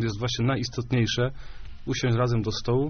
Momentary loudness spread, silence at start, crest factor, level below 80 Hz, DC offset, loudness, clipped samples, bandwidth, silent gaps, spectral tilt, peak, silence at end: 13 LU; 0 s; 14 dB; -42 dBFS; under 0.1%; -26 LUFS; under 0.1%; 6.6 kHz; none; -5.5 dB/octave; -12 dBFS; 0 s